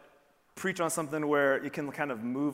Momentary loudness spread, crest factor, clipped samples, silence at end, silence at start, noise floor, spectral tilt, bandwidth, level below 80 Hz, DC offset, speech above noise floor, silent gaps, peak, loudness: 8 LU; 18 dB; under 0.1%; 0 s; 0.55 s; -64 dBFS; -4.5 dB/octave; 16 kHz; -78 dBFS; under 0.1%; 34 dB; none; -14 dBFS; -31 LUFS